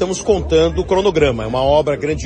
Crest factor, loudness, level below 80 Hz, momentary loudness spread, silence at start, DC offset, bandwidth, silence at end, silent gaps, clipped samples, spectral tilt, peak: 14 dB; -16 LUFS; -30 dBFS; 4 LU; 0 s; under 0.1%; 9.4 kHz; 0 s; none; under 0.1%; -5.5 dB/octave; -2 dBFS